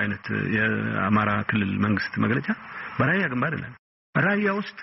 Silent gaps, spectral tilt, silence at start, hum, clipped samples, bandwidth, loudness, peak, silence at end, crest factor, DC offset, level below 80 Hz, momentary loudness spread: 3.79-4.13 s; -5 dB/octave; 0 s; none; under 0.1%; 5.8 kHz; -24 LUFS; -10 dBFS; 0 s; 14 dB; under 0.1%; -58 dBFS; 8 LU